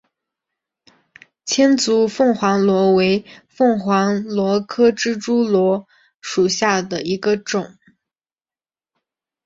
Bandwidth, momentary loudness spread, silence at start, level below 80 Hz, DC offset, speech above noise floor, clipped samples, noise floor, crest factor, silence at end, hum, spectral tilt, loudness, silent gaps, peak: 8 kHz; 9 LU; 1.45 s; -60 dBFS; under 0.1%; over 73 dB; under 0.1%; under -90 dBFS; 16 dB; 1.75 s; none; -4.5 dB/octave; -17 LUFS; 6.16-6.20 s; -2 dBFS